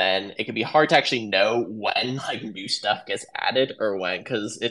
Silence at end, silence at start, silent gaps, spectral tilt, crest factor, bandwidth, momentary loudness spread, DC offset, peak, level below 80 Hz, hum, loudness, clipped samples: 0 s; 0 s; none; -3.5 dB/octave; 22 dB; 11.5 kHz; 10 LU; under 0.1%; -2 dBFS; -74 dBFS; none; -23 LUFS; under 0.1%